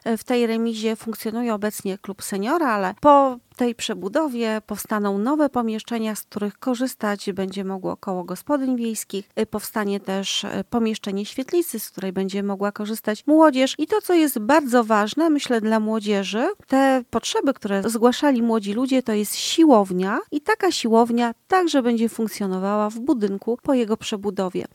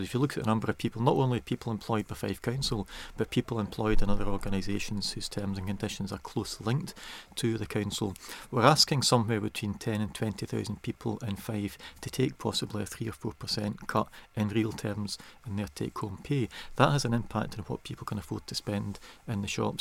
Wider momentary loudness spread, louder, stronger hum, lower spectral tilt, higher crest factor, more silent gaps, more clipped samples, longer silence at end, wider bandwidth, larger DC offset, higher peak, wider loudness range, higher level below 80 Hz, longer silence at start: about the same, 10 LU vs 12 LU; first, -22 LUFS vs -31 LUFS; neither; about the same, -4.5 dB/octave vs -5 dB/octave; about the same, 20 dB vs 24 dB; neither; neither; about the same, 0.1 s vs 0 s; about the same, 17 kHz vs 16.5 kHz; neither; first, -2 dBFS vs -6 dBFS; about the same, 6 LU vs 6 LU; second, -62 dBFS vs -42 dBFS; about the same, 0.05 s vs 0 s